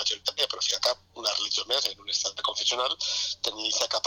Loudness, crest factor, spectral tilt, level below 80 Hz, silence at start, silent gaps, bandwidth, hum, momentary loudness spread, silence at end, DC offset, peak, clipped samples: -26 LUFS; 16 dB; 1 dB/octave; -66 dBFS; 0 s; none; 19 kHz; none; 3 LU; 0.05 s; under 0.1%; -12 dBFS; under 0.1%